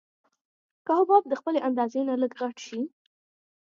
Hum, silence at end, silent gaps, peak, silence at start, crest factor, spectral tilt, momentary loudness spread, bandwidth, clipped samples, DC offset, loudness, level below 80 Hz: none; 0.75 s; none; -8 dBFS; 0.85 s; 20 dB; -5 dB/octave; 14 LU; 7.6 kHz; under 0.1%; under 0.1%; -26 LUFS; -86 dBFS